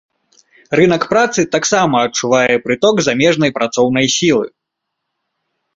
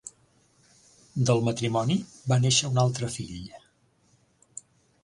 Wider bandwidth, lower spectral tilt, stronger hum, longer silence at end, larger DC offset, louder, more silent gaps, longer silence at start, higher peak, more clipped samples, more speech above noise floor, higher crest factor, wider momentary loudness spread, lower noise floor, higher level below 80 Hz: second, 8 kHz vs 11.5 kHz; about the same, -4 dB/octave vs -4.5 dB/octave; neither; second, 1.3 s vs 1.45 s; neither; first, -13 LUFS vs -26 LUFS; neither; first, 0.7 s vs 0.05 s; first, 0 dBFS vs -8 dBFS; neither; first, 63 dB vs 40 dB; second, 14 dB vs 20 dB; second, 3 LU vs 23 LU; first, -76 dBFS vs -65 dBFS; first, -52 dBFS vs -58 dBFS